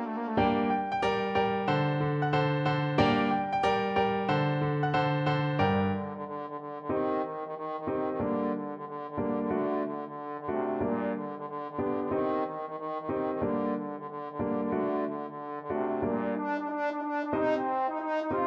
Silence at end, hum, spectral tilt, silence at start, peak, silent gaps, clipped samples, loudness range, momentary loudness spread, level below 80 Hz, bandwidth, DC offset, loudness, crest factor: 0 s; none; -8 dB/octave; 0 s; -12 dBFS; none; under 0.1%; 5 LU; 10 LU; -58 dBFS; 8 kHz; under 0.1%; -30 LUFS; 18 dB